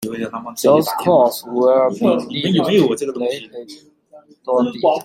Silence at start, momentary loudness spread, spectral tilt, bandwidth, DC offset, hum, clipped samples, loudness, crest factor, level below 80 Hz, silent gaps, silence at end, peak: 0 s; 12 LU; -5.5 dB/octave; 16.5 kHz; under 0.1%; none; under 0.1%; -17 LUFS; 16 dB; -60 dBFS; none; 0 s; -2 dBFS